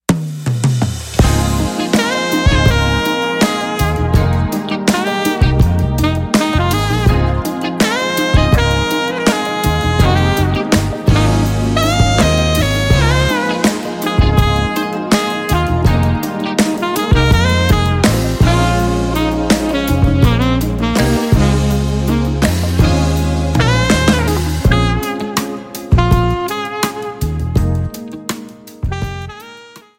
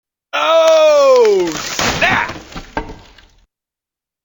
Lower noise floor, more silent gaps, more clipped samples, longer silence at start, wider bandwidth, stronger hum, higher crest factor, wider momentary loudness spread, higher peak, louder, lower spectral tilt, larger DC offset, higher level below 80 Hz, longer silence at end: second, -38 dBFS vs -87 dBFS; neither; neither; second, 0.1 s vs 0.35 s; second, 17 kHz vs 19.5 kHz; neither; about the same, 12 dB vs 14 dB; second, 7 LU vs 17 LU; about the same, 0 dBFS vs 0 dBFS; about the same, -14 LUFS vs -12 LUFS; first, -5.5 dB/octave vs -3 dB/octave; neither; first, -20 dBFS vs -40 dBFS; second, 0.2 s vs 1.3 s